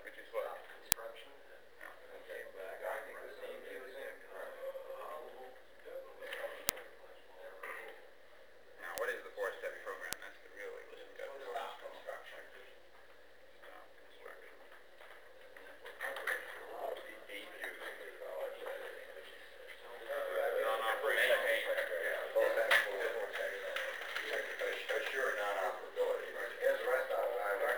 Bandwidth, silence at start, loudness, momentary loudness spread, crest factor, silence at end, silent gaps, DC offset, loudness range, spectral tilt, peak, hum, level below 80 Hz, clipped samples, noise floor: over 20 kHz; 0 s; -39 LUFS; 22 LU; 40 dB; 0 s; none; 0.1%; 16 LU; -0.5 dB/octave; 0 dBFS; none; -76 dBFS; under 0.1%; -62 dBFS